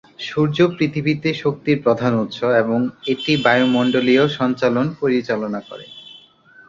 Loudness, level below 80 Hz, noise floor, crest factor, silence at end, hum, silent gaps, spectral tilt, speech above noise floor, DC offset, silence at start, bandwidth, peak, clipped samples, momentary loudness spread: -18 LUFS; -56 dBFS; -48 dBFS; 16 dB; 0.5 s; none; none; -7 dB/octave; 30 dB; under 0.1%; 0.2 s; 7.4 kHz; -2 dBFS; under 0.1%; 11 LU